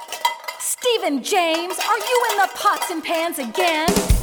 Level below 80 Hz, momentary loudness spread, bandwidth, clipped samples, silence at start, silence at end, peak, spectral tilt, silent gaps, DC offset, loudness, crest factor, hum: -32 dBFS; 6 LU; over 20 kHz; under 0.1%; 0 s; 0 s; -2 dBFS; -3 dB/octave; none; under 0.1%; -20 LUFS; 18 dB; none